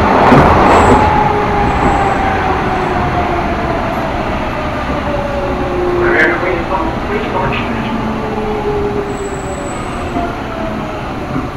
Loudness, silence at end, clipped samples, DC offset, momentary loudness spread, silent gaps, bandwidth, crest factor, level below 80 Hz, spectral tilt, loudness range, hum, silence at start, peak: -14 LUFS; 0 s; 0.1%; under 0.1%; 12 LU; none; 16 kHz; 14 dB; -24 dBFS; -6.5 dB/octave; 7 LU; none; 0 s; 0 dBFS